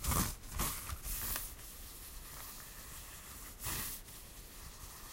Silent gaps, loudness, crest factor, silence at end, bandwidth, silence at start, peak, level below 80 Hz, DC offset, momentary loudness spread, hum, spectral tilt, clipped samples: none; -42 LUFS; 22 dB; 0 s; 16 kHz; 0 s; -20 dBFS; -48 dBFS; under 0.1%; 13 LU; none; -2.5 dB/octave; under 0.1%